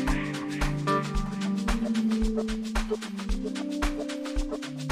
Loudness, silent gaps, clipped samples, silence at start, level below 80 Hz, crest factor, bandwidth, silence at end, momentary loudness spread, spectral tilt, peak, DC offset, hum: -30 LUFS; none; under 0.1%; 0 s; -34 dBFS; 16 dB; 15 kHz; 0 s; 6 LU; -5.5 dB/octave; -12 dBFS; under 0.1%; none